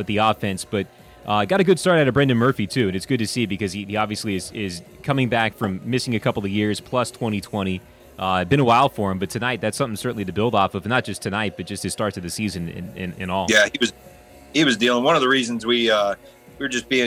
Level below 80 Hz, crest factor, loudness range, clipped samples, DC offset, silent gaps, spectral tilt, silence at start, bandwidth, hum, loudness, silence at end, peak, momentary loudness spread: -52 dBFS; 18 dB; 4 LU; under 0.1%; under 0.1%; none; -4.5 dB/octave; 0 s; 17 kHz; none; -21 LUFS; 0 s; -4 dBFS; 11 LU